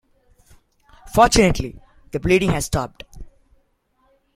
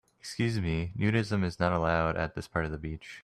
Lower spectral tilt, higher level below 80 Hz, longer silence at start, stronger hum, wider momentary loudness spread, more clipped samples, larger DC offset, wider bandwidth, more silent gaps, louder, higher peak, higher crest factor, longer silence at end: second, -4.5 dB/octave vs -6.5 dB/octave; first, -36 dBFS vs -48 dBFS; first, 1.05 s vs 0.25 s; neither; first, 18 LU vs 9 LU; neither; neither; first, 16.5 kHz vs 12.5 kHz; neither; first, -19 LUFS vs -30 LUFS; first, -2 dBFS vs -12 dBFS; about the same, 20 dB vs 18 dB; first, 1.1 s vs 0.05 s